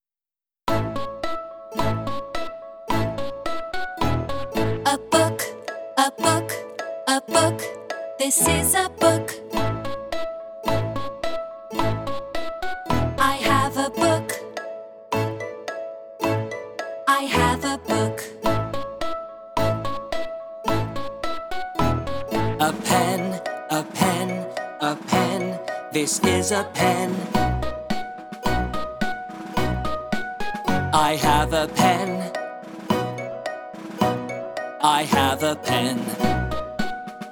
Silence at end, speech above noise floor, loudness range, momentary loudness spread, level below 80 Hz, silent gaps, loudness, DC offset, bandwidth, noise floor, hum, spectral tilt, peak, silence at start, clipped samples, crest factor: 0 s; over 69 dB; 5 LU; 12 LU; -40 dBFS; none; -24 LUFS; under 0.1%; over 20 kHz; under -90 dBFS; none; -4 dB/octave; -2 dBFS; 0 s; under 0.1%; 22 dB